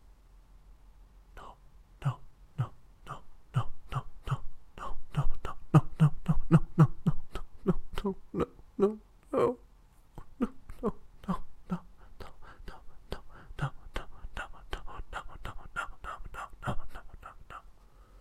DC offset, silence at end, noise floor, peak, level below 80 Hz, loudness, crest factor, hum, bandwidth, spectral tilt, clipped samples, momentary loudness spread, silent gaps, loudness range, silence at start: under 0.1%; 0.05 s; -58 dBFS; -10 dBFS; -42 dBFS; -34 LUFS; 22 dB; none; 9.6 kHz; -8.5 dB/octave; under 0.1%; 24 LU; none; 14 LU; 0.7 s